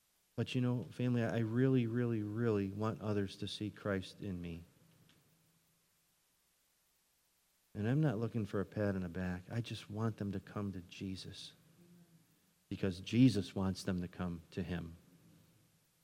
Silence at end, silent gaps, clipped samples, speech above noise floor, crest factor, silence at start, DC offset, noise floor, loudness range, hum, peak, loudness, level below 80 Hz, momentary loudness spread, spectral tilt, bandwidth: 1.05 s; none; under 0.1%; 39 dB; 22 dB; 0.35 s; under 0.1%; -76 dBFS; 9 LU; none; -18 dBFS; -38 LUFS; -72 dBFS; 13 LU; -7 dB/octave; 15.5 kHz